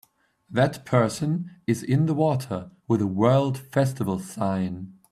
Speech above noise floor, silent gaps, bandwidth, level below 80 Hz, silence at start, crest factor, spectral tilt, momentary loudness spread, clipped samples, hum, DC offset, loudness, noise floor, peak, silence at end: 29 dB; none; 14.5 kHz; -62 dBFS; 0.5 s; 18 dB; -7 dB/octave; 9 LU; under 0.1%; none; under 0.1%; -25 LUFS; -53 dBFS; -6 dBFS; 0.2 s